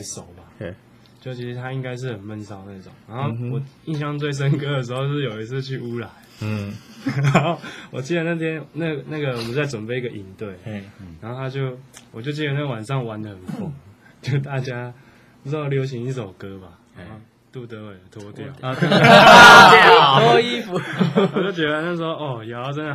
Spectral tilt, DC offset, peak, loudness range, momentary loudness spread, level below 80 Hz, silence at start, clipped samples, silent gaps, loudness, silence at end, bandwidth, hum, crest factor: -4.5 dB/octave; under 0.1%; 0 dBFS; 20 LU; 25 LU; -52 dBFS; 0 s; 0.1%; none; -16 LUFS; 0 s; 16 kHz; none; 18 dB